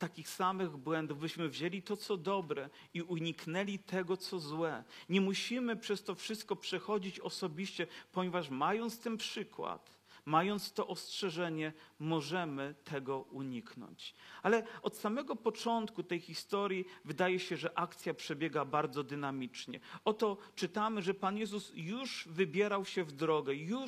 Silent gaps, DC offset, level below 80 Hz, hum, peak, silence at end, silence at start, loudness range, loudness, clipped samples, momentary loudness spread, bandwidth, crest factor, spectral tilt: none; under 0.1%; -88 dBFS; none; -16 dBFS; 0 s; 0 s; 2 LU; -38 LUFS; under 0.1%; 9 LU; 15 kHz; 22 dB; -5 dB/octave